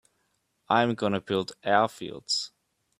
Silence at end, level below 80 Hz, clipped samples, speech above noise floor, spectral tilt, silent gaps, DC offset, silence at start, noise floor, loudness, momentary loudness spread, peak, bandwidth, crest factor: 0.55 s; -70 dBFS; under 0.1%; 47 dB; -4 dB/octave; none; under 0.1%; 0.7 s; -74 dBFS; -27 LUFS; 6 LU; -6 dBFS; 14.5 kHz; 22 dB